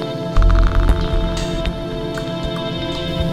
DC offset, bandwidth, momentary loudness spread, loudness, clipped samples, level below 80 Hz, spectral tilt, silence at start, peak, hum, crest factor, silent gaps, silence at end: 0.5%; 10 kHz; 7 LU; -20 LUFS; under 0.1%; -18 dBFS; -6.5 dB/octave; 0 s; -4 dBFS; none; 14 dB; none; 0 s